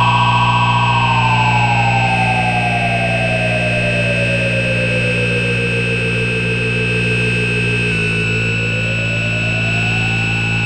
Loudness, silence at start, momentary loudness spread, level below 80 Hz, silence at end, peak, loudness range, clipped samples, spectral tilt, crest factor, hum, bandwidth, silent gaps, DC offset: -14 LUFS; 0 s; 3 LU; -34 dBFS; 0 s; -2 dBFS; 2 LU; under 0.1%; -5.5 dB/octave; 12 dB; none; 9 kHz; none; under 0.1%